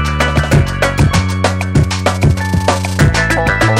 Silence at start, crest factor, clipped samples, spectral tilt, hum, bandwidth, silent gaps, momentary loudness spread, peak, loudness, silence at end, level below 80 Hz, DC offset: 0 s; 12 dB; under 0.1%; -5.5 dB/octave; none; 16 kHz; none; 3 LU; 0 dBFS; -13 LUFS; 0 s; -22 dBFS; under 0.1%